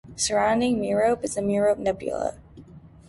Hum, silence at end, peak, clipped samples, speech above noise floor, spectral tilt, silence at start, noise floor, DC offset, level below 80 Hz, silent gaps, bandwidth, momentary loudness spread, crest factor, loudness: none; 0.2 s; -10 dBFS; under 0.1%; 23 dB; -4 dB/octave; 0.05 s; -47 dBFS; under 0.1%; -52 dBFS; none; 11.5 kHz; 7 LU; 14 dB; -24 LUFS